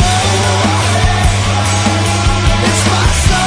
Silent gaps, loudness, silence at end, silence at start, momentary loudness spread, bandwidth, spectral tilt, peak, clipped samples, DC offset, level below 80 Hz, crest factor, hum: none; -12 LUFS; 0 s; 0 s; 1 LU; 11 kHz; -4 dB/octave; 0 dBFS; under 0.1%; under 0.1%; -18 dBFS; 10 dB; none